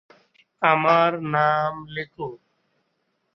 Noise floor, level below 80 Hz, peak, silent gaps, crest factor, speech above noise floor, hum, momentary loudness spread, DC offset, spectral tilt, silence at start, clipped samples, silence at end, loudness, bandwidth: -73 dBFS; -64 dBFS; -4 dBFS; none; 20 dB; 51 dB; none; 16 LU; under 0.1%; -7 dB/octave; 0.6 s; under 0.1%; 1 s; -21 LUFS; 6.2 kHz